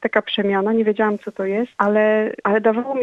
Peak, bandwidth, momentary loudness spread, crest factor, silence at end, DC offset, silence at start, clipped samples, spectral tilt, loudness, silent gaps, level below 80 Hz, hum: -2 dBFS; 6.4 kHz; 6 LU; 18 dB; 0 s; under 0.1%; 0 s; under 0.1%; -7.5 dB/octave; -19 LUFS; none; -68 dBFS; none